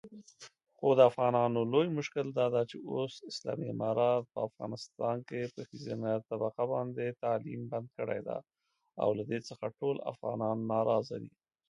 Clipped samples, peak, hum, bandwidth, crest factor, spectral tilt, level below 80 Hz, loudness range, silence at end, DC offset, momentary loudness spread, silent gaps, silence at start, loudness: under 0.1%; -10 dBFS; none; 10.5 kHz; 24 dB; -7 dB/octave; -78 dBFS; 6 LU; 0.4 s; under 0.1%; 12 LU; none; 0.05 s; -33 LUFS